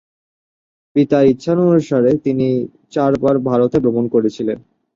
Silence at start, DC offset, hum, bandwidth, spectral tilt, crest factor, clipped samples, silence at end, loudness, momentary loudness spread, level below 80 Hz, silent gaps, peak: 0.95 s; under 0.1%; none; 7.6 kHz; -8.5 dB/octave; 14 dB; under 0.1%; 0.35 s; -16 LUFS; 8 LU; -52 dBFS; none; -2 dBFS